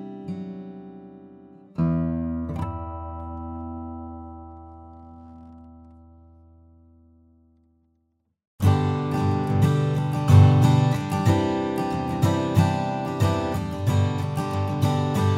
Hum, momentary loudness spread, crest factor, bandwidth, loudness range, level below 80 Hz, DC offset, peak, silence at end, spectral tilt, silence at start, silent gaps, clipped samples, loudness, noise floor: none; 21 LU; 20 dB; 15.5 kHz; 18 LU; -50 dBFS; under 0.1%; -4 dBFS; 0 s; -7.5 dB/octave; 0 s; 8.47-8.58 s; under 0.1%; -23 LUFS; -71 dBFS